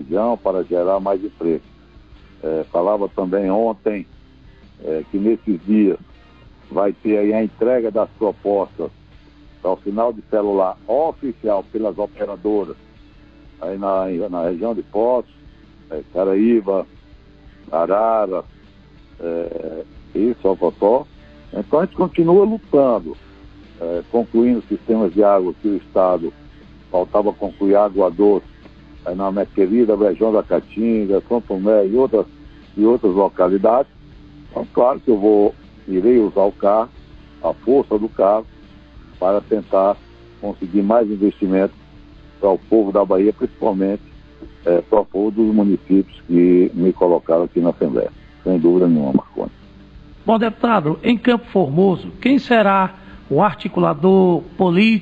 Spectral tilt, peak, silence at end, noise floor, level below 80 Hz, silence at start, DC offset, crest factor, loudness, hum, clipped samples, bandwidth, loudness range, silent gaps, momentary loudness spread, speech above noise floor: -9.5 dB/octave; -2 dBFS; 0 s; -46 dBFS; -46 dBFS; 0 s; 0.1%; 16 dB; -18 LUFS; none; under 0.1%; 5.2 kHz; 5 LU; none; 12 LU; 29 dB